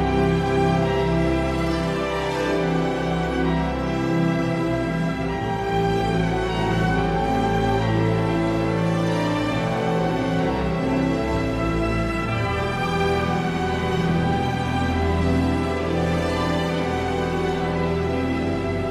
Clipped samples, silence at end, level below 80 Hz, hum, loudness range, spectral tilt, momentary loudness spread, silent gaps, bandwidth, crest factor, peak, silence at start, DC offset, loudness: under 0.1%; 0 s; -34 dBFS; none; 1 LU; -7 dB/octave; 3 LU; none; 13 kHz; 14 dB; -8 dBFS; 0 s; under 0.1%; -22 LUFS